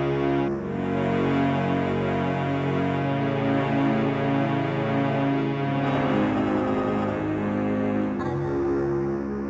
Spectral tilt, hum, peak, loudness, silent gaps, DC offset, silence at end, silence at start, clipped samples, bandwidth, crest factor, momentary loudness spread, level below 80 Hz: -8.5 dB/octave; none; -12 dBFS; -25 LUFS; none; under 0.1%; 0 s; 0 s; under 0.1%; 8 kHz; 12 dB; 3 LU; -48 dBFS